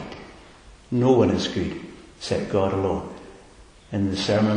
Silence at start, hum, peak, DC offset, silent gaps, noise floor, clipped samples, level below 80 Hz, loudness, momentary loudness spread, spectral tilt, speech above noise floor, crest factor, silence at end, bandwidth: 0 s; none; -6 dBFS; under 0.1%; none; -49 dBFS; under 0.1%; -46 dBFS; -23 LUFS; 21 LU; -6.5 dB/octave; 27 dB; 18 dB; 0 s; 10.5 kHz